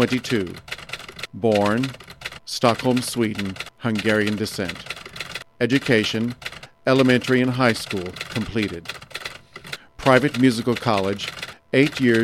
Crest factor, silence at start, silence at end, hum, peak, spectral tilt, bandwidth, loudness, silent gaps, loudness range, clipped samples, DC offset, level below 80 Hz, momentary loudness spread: 20 dB; 0 s; 0 s; none; -2 dBFS; -5.5 dB/octave; 15.5 kHz; -22 LUFS; none; 3 LU; under 0.1%; under 0.1%; -52 dBFS; 16 LU